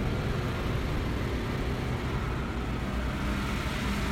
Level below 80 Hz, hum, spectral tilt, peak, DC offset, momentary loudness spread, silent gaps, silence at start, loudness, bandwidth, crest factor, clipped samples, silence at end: -34 dBFS; none; -6 dB/octave; -16 dBFS; under 0.1%; 2 LU; none; 0 s; -32 LUFS; 16 kHz; 14 dB; under 0.1%; 0 s